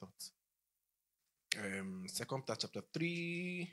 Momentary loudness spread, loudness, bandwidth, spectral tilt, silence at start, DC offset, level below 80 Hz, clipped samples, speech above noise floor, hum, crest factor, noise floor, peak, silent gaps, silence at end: 9 LU; -42 LUFS; 15.5 kHz; -4 dB/octave; 0 s; under 0.1%; -84 dBFS; under 0.1%; 47 dB; none; 30 dB; -89 dBFS; -14 dBFS; none; 0 s